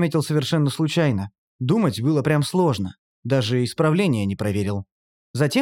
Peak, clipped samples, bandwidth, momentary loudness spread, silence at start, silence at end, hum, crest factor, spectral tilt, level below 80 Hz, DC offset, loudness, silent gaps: -6 dBFS; under 0.1%; 16.5 kHz; 10 LU; 0 s; 0 s; none; 14 dB; -6.5 dB/octave; -62 dBFS; under 0.1%; -22 LUFS; 1.38-1.59 s, 2.98-3.23 s, 4.91-5.34 s